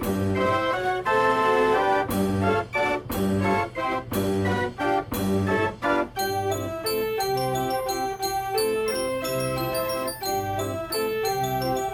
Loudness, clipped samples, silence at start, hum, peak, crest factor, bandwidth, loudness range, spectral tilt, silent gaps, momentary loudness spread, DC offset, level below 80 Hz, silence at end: -25 LUFS; under 0.1%; 0 s; none; -10 dBFS; 14 dB; 17 kHz; 3 LU; -5 dB/octave; none; 6 LU; under 0.1%; -48 dBFS; 0 s